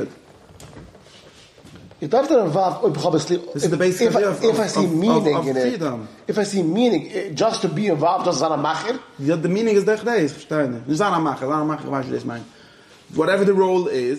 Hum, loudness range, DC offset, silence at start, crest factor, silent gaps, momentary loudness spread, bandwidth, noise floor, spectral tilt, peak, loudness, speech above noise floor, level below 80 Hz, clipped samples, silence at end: none; 3 LU; under 0.1%; 0 s; 16 dB; none; 8 LU; 13.5 kHz; -48 dBFS; -5.5 dB/octave; -4 dBFS; -20 LUFS; 28 dB; -62 dBFS; under 0.1%; 0 s